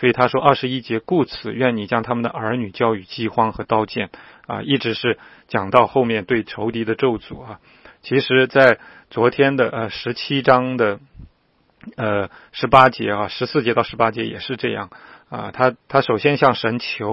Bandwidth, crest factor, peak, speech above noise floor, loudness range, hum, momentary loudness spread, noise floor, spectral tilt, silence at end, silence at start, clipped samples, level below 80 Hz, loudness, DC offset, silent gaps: 7.8 kHz; 20 dB; 0 dBFS; 42 dB; 4 LU; none; 14 LU; -61 dBFS; -8 dB/octave; 0 s; 0 s; under 0.1%; -52 dBFS; -19 LUFS; under 0.1%; none